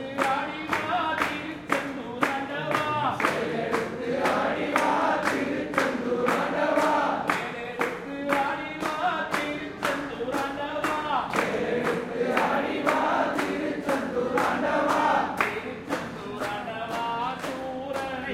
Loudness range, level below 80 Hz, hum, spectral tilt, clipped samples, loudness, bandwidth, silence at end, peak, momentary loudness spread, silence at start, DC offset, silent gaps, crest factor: 3 LU; -60 dBFS; none; -4.5 dB/octave; under 0.1%; -27 LUFS; 16.5 kHz; 0 s; -6 dBFS; 8 LU; 0 s; under 0.1%; none; 22 dB